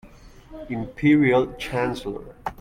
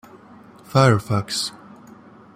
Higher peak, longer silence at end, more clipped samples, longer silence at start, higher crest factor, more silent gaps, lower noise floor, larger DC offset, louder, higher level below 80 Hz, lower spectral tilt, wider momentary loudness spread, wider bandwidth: second, -8 dBFS vs -2 dBFS; second, 0.1 s vs 0.85 s; neither; second, 0.05 s vs 0.75 s; about the same, 16 dB vs 20 dB; neither; about the same, -46 dBFS vs -46 dBFS; neither; about the same, -22 LUFS vs -20 LUFS; first, -46 dBFS vs -56 dBFS; first, -7 dB/octave vs -5.5 dB/octave; first, 17 LU vs 9 LU; second, 12 kHz vs 15.5 kHz